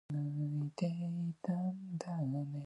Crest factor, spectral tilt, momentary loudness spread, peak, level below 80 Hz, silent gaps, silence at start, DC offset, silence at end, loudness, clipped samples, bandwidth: 14 dB; -8.5 dB/octave; 2 LU; -24 dBFS; -78 dBFS; none; 0.1 s; under 0.1%; 0 s; -39 LUFS; under 0.1%; 10.5 kHz